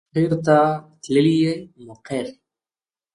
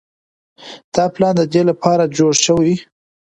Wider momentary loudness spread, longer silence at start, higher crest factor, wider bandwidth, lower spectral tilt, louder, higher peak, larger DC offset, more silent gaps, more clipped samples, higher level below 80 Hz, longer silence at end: first, 13 LU vs 10 LU; second, 0.15 s vs 0.6 s; about the same, 16 dB vs 16 dB; first, 11 kHz vs 9.4 kHz; first, -7 dB/octave vs -4.5 dB/octave; second, -20 LUFS vs -15 LUFS; second, -4 dBFS vs 0 dBFS; neither; second, none vs 0.84-0.92 s; neither; about the same, -58 dBFS vs -54 dBFS; first, 0.85 s vs 0.4 s